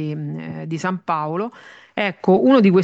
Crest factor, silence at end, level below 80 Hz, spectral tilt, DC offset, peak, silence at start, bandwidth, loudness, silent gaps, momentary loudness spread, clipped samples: 16 dB; 0 s; -64 dBFS; -7.5 dB/octave; under 0.1%; -4 dBFS; 0 s; 7.8 kHz; -20 LUFS; none; 16 LU; under 0.1%